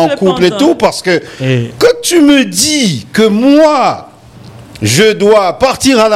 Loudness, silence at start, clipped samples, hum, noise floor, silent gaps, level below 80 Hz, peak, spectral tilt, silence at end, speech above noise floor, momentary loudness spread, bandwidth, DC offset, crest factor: -9 LUFS; 0 s; under 0.1%; none; -34 dBFS; none; -42 dBFS; 0 dBFS; -4 dB/octave; 0 s; 25 dB; 7 LU; 16 kHz; under 0.1%; 10 dB